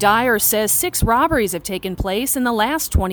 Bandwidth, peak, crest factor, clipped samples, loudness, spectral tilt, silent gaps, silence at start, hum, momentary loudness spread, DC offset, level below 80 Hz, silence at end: over 20 kHz; -2 dBFS; 16 dB; under 0.1%; -17 LUFS; -3.5 dB/octave; none; 0 s; none; 8 LU; under 0.1%; -30 dBFS; 0 s